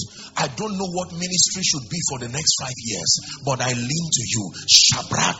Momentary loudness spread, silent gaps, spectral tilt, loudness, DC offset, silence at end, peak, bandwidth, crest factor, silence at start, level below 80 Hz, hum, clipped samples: 14 LU; none; -2 dB/octave; -19 LUFS; under 0.1%; 0 s; 0 dBFS; 8.2 kHz; 22 dB; 0 s; -54 dBFS; none; under 0.1%